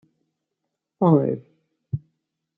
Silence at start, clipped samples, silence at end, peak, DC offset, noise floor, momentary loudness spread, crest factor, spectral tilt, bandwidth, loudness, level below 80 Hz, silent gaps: 1 s; under 0.1%; 0.6 s; -6 dBFS; under 0.1%; -81 dBFS; 15 LU; 20 dB; -12.5 dB/octave; 3.8 kHz; -23 LUFS; -64 dBFS; none